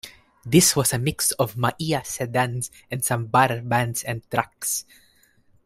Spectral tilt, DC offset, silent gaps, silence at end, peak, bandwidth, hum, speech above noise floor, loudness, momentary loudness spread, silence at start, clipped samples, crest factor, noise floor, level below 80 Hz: -4 dB/octave; under 0.1%; none; 0.85 s; -2 dBFS; 16 kHz; none; 36 dB; -22 LUFS; 11 LU; 0.05 s; under 0.1%; 22 dB; -59 dBFS; -54 dBFS